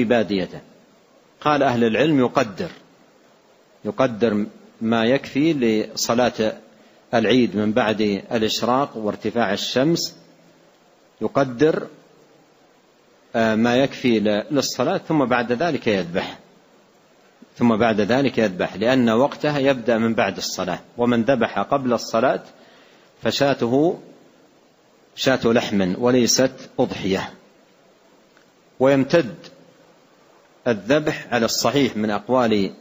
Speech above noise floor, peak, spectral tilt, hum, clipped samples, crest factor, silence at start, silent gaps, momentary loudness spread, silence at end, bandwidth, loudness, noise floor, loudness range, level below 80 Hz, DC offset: 36 dB; -2 dBFS; -5 dB/octave; none; under 0.1%; 18 dB; 0 s; none; 9 LU; 0.05 s; 16 kHz; -20 LUFS; -55 dBFS; 4 LU; -56 dBFS; under 0.1%